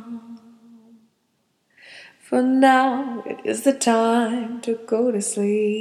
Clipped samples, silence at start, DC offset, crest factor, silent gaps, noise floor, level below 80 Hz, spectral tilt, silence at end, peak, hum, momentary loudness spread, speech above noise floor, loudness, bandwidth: under 0.1%; 0 s; under 0.1%; 18 dB; none; -69 dBFS; -78 dBFS; -4 dB/octave; 0 s; -4 dBFS; none; 12 LU; 49 dB; -20 LUFS; 14.5 kHz